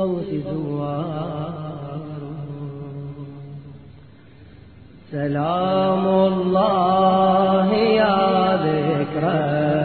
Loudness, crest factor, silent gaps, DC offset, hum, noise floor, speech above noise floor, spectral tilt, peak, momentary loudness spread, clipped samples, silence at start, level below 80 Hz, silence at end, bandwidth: -19 LUFS; 16 dB; none; 0.2%; none; -46 dBFS; 26 dB; -10.5 dB/octave; -4 dBFS; 17 LU; under 0.1%; 0 s; -52 dBFS; 0 s; 4.6 kHz